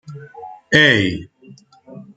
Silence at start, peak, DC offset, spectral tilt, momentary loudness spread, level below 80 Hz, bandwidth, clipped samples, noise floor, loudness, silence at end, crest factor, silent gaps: 0.1 s; 0 dBFS; under 0.1%; -4.5 dB/octave; 25 LU; -52 dBFS; 9.2 kHz; under 0.1%; -46 dBFS; -14 LUFS; 0.15 s; 20 dB; none